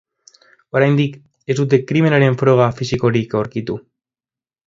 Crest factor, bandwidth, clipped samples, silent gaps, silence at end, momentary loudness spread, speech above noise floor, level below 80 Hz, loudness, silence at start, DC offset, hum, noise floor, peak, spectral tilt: 18 dB; 7.8 kHz; under 0.1%; none; 0.9 s; 11 LU; over 75 dB; -50 dBFS; -16 LUFS; 0.75 s; under 0.1%; none; under -90 dBFS; 0 dBFS; -7.5 dB/octave